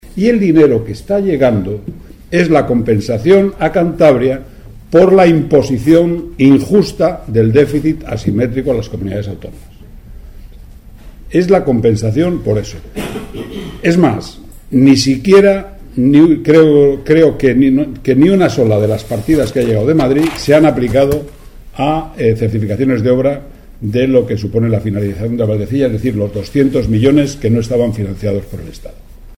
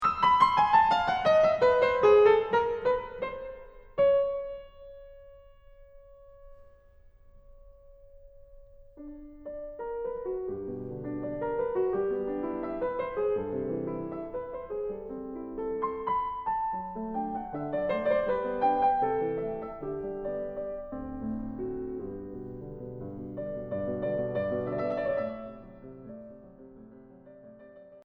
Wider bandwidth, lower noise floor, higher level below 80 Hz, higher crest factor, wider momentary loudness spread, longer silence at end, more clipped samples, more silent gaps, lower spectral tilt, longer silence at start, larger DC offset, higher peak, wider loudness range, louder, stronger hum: first, 16 kHz vs 8.4 kHz; second, -34 dBFS vs -56 dBFS; first, -34 dBFS vs -54 dBFS; second, 12 dB vs 22 dB; second, 13 LU vs 19 LU; about the same, 0.05 s vs 0.05 s; neither; neither; about the same, -7.5 dB/octave vs -7 dB/octave; about the same, 0.05 s vs 0 s; neither; first, 0 dBFS vs -8 dBFS; second, 6 LU vs 13 LU; first, -12 LUFS vs -29 LUFS; neither